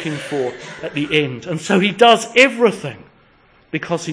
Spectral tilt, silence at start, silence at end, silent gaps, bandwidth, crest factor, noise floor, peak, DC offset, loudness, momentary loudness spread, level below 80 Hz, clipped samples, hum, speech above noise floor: -4.5 dB/octave; 0 s; 0 s; none; 10.5 kHz; 18 dB; -52 dBFS; 0 dBFS; under 0.1%; -16 LUFS; 16 LU; -58 dBFS; under 0.1%; none; 35 dB